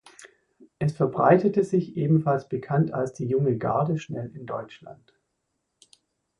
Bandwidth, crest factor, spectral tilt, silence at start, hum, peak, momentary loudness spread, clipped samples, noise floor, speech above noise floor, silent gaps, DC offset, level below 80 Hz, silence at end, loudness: 10.5 kHz; 20 dB; -8.5 dB/octave; 0.2 s; none; -6 dBFS; 16 LU; under 0.1%; -78 dBFS; 54 dB; none; under 0.1%; -62 dBFS; 1.45 s; -25 LUFS